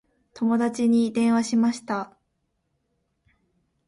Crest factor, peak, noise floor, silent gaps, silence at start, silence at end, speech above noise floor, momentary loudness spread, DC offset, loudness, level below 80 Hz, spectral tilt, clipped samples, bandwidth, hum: 14 dB; -10 dBFS; -75 dBFS; none; 0.35 s; 1.8 s; 53 dB; 10 LU; under 0.1%; -23 LUFS; -68 dBFS; -5.5 dB/octave; under 0.1%; 11.5 kHz; none